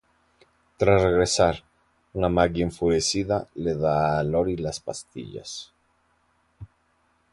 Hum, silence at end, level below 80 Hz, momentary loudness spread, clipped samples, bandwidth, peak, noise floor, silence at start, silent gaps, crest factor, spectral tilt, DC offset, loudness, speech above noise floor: none; 0.7 s; -44 dBFS; 17 LU; under 0.1%; 11.5 kHz; -4 dBFS; -67 dBFS; 0.8 s; none; 22 dB; -5 dB/octave; under 0.1%; -23 LUFS; 44 dB